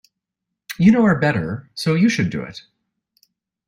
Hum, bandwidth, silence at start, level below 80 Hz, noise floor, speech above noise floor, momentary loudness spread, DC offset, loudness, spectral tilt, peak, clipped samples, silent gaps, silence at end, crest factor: none; 16 kHz; 0.7 s; -54 dBFS; -82 dBFS; 65 dB; 20 LU; under 0.1%; -18 LUFS; -6.5 dB/octave; -2 dBFS; under 0.1%; none; 1.1 s; 18 dB